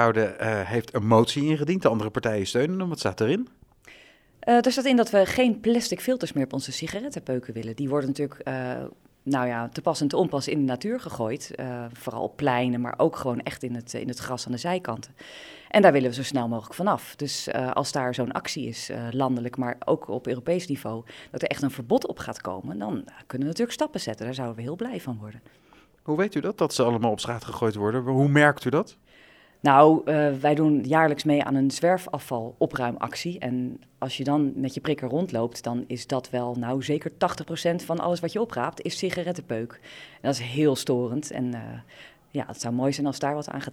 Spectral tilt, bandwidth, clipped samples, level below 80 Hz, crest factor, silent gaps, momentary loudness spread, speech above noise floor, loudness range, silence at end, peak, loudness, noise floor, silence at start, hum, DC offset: -5.5 dB/octave; 17 kHz; under 0.1%; -62 dBFS; 24 dB; none; 13 LU; 29 dB; 8 LU; 0 s; -2 dBFS; -26 LUFS; -55 dBFS; 0 s; none; under 0.1%